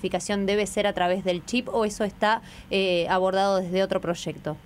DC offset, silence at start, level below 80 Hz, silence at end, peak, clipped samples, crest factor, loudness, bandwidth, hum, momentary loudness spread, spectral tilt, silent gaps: under 0.1%; 0 s; -52 dBFS; 0.05 s; -10 dBFS; under 0.1%; 14 dB; -25 LUFS; 15.5 kHz; none; 6 LU; -4.5 dB/octave; none